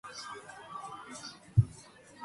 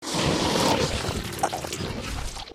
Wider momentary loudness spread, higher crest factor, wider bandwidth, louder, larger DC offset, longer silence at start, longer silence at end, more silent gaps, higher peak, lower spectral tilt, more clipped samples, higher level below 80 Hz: first, 18 LU vs 10 LU; first, 24 dB vs 18 dB; second, 11.5 kHz vs 16 kHz; second, -36 LUFS vs -26 LUFS; neither; about the same, 0.05 s vs 0 s; about the same, 0 s vs 0 s; neither; about the same, -12 dBFS vs -10 dBFS; first, -5.5 dB/octave vs -4 dB/octave; neither; second, -52 dBFS vs -38 dBFS